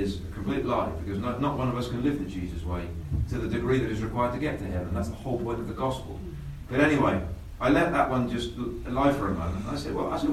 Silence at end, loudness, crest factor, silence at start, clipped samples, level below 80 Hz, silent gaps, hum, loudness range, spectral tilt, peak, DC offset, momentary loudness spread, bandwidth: 0 s; -28 LUFS; 20 dB; 0 s; under 0.1%; -40 dBFS; none; none; 4 LU; -7 dB/octave; -8 dBFS; under 0.1%; 10 LU; 13.5 kHz